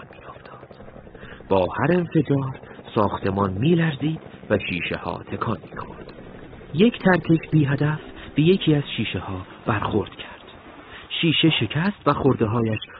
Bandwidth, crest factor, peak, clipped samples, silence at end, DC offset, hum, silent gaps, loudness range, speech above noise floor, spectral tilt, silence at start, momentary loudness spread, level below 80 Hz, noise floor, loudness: 5 kHz; 20 dB; -4 dBFS; under 0.1%; 0 s; under 0.1%; none; none; 4 LU; 22 dB; -11 dB/octave; 0 s; 23 LU; -50 dBFS; -43 dBFS; -22 LUFS